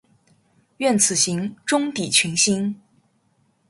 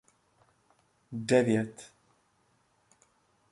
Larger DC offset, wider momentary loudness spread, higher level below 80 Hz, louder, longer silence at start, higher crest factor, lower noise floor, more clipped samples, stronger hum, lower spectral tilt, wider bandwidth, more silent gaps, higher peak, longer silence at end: neither; second, 9 LU vs 25 LU; first, -64 dBFS vs -74 dBFS; first, -19 LUFS vs -29 LUFS; second, 0.8 s vs 1.1 s; about the same, 20 dB vs 24 dB; second, -64 dBFS vs -71 dBFS; neither; neither; second, -2.5 dB/octave vs -6 dB/octave; about the same, 12 kHz vs 11.5 kHz; neither; first, -2 dBFS vs -10 dBFS; second, 0.95 s vs 1.65 s